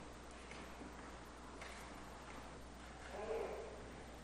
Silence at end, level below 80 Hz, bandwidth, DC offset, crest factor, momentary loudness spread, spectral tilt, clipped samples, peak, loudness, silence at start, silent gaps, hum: 0 s; -60 dBFS; 15 kHz; under 0.1%; 18 dB; 10 LU; -4.5 dB/octave; under 0.1%; -34 dBFS; -51 LUFS; 0 s; none; none